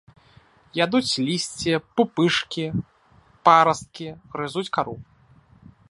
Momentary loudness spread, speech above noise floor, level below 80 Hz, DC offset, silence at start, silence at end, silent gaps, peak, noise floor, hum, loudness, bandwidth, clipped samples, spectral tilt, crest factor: 17 LU; 34 dB; -58 dBFS; under 0.1%; 0.75 s; 0.85 s; none; -2 dBFS; -56 dBFS; none; -22 LUFS; 11.5 kHz; under 0.1%; -4.5 dB/octave; 22 dB